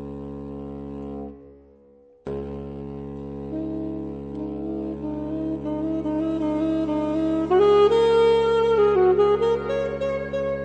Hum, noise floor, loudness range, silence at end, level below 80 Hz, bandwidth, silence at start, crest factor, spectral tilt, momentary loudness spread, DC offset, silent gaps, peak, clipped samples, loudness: none; -53 dBFS; 15 LU; 0 s; -46 dBFS; 8.8 kHz; 0 s; 16 dB; -7.5 dB/octave; 17 LU; under 0.1%; none; -8 dBFS; under 0.1%; -22 LUFS